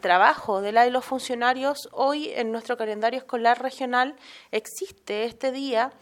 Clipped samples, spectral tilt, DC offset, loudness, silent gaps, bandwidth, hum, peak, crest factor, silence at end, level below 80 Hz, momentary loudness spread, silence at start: under 0.1%; -3 dB/octave; under 0.1%; -25 LUFS; none; 17 kHz; none; -4 dBFS; 20 dB; 0.1 s; -70 dBFS; 10 LU; 0.05 s